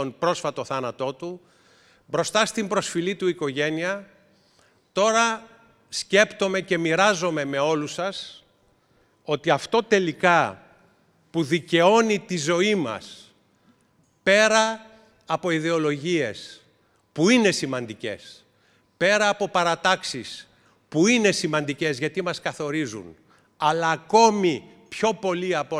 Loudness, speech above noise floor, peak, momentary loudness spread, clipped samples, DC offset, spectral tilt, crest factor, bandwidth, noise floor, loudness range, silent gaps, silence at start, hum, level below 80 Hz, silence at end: -23 LUFS; 41 dB; -4 dBFS; 15 LU; under 0.1%; under 0.1%; -4 dB/octave; 20 dB; 13.5 kHz; -64 dBFS; 4 LU; none; 0 s; none; -68 dBFS; 0 s